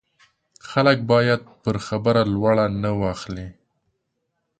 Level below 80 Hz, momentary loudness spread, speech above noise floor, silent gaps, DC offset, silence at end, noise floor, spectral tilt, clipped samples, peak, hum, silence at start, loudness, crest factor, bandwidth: -48 dBFS; 13 LU; 55 dB; none; under 0.1%; 1.05 s; -75 dBFS; -7 dB/octave; under 0.1%; -4 dBFS; none; 0.65 s; -21 LUFS; 18 dB; 9.2 kHz